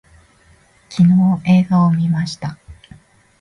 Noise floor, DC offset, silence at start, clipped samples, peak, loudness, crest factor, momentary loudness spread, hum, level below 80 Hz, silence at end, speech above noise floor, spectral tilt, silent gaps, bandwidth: -52 dBFS; under 0.1%; 0.9 s; under 0.1%; -4 dBFS; -15 LUFS; 14 dB; 16 LU; none; -50 dBFS; 0.7 s; 38 dB; -8 dB/octave; none; 10 kHz